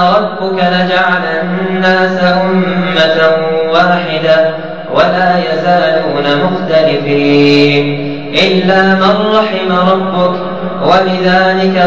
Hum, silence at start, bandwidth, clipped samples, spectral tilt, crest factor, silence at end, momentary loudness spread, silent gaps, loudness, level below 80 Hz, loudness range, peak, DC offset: none; 0 s; 7.4 kHz; under 0.1%; -6.5 dB/octave; 10 dB; 0 s; 6 LU; none; -10 LUFS; -48 dBFS; 1 LU; 0 dBFS; 3%